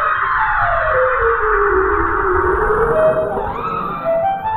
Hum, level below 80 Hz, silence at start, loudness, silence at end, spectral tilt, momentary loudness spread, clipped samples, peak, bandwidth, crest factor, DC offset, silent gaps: none; -30 dBFS; 0 s; -16 LUFS; 0 s; -8 dB/octave; 6 LU; under 0.1%; -4 dBFS; 12.5 kHz; 12 dB; under 0.1%; none